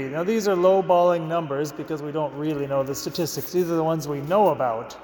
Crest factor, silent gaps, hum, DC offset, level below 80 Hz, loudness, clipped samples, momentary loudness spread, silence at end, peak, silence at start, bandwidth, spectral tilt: 16 dB; none; none; under 0.1%; -60 dBFS; -23 LUFS; under 0.1%; 9 LU; 0 s; -6 dBFS; 0 s; 19 kHz; -6 dB/octave